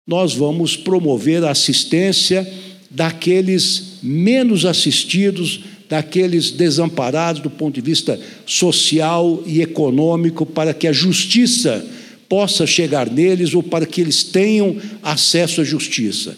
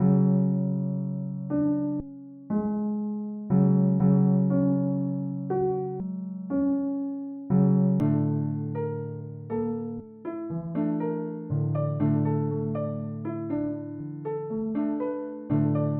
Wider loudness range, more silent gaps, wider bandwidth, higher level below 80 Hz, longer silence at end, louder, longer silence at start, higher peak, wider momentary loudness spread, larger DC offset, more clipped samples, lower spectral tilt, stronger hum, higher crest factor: second, 2 LU vs 5 LU; neither; first, 15.5 kHz vs 2.6 kHz; second, -70 dBFS vs -58 dBFS; about the same, 0 s vs 0 s; first, -15 LUFS vs -27 LUFS; about the same, 0.05 s vs 0 s; first, -2 dBFS vs -10 dBFS; second, 8 LU vs 12 LU; neither; neither; second, -4 dB/octave vs -13.5 dB/octave; neither; about the same, 14 dB vs 16 dB